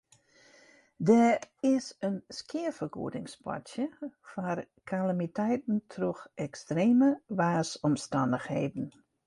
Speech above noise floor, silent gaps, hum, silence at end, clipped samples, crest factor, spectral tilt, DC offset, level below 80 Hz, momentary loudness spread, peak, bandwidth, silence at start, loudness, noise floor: 32 dB; none; none; 0.35 s; under 0.1%; 20 dB; -6.5 dB/octave; under 0.1%; -70 dBFS; 15 LU; -12 dBFS; 11.5 kHz; 1 s; -31 LUFS; -62 dBFS